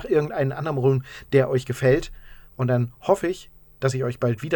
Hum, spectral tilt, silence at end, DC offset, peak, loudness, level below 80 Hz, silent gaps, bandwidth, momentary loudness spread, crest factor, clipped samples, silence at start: none; -7 dB/octave; 0 s; under 0.1%; -4 dBFS; -23 LUFS; -46 dBFS; none; 19.5 kHz; 7 LU; 18 dB; under 0.1%; 0 s